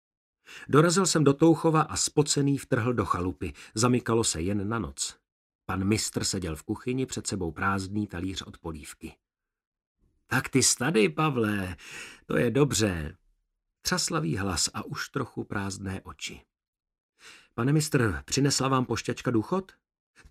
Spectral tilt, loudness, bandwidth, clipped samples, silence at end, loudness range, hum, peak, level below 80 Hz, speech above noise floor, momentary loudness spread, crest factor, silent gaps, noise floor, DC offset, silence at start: -4.5 dB/octave; -27 LUFS; 15.5 kHz; under 0.1%; 0.65 s; 8 LU; none; -6 dBFS; -52 dBFS; 51 dB; 16 LU; 22 dB; 5.32-5.59 s, 9.67-9.72 s, 9.87-9.95 s, 16.68-16.73 s, 17.00-17.13 s; -78 dBFS; under 0.1%; 0.5 s